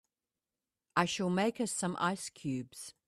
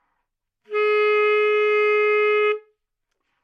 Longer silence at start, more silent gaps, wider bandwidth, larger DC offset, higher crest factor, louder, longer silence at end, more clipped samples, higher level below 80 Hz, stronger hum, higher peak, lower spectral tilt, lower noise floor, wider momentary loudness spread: first, 0.95 s vs 0.7 s; neither; first, 14 kHz vs 5.4 kHz; neither; first, 24 dB vs 12 dB; second, -34 LUFS vs -19 LUFS; second, 0.15 s vs 0.85 s; neither; first, -74 dBFS vs -84 dBFS; neither; about the same, -12 dBFS vs -10 dBFS; first, -4.5 dB/octave vs -1.5 dB/octave; first, under -90 dBFS vs -77 dBFS; first, 8 LU vs 5 LU